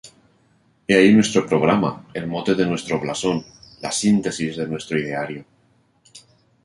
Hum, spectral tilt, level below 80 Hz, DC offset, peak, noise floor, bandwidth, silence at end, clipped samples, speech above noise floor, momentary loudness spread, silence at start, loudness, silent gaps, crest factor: none; -5 dB/octave; -56 dBFS; under 0.1%; -2 dBFS; -61 dBFS; 11.5 kHz; 0.45 s; under 0.1%; 41 dB; 14 LU; 0.05 s; -20 LUFS; none; 20 dB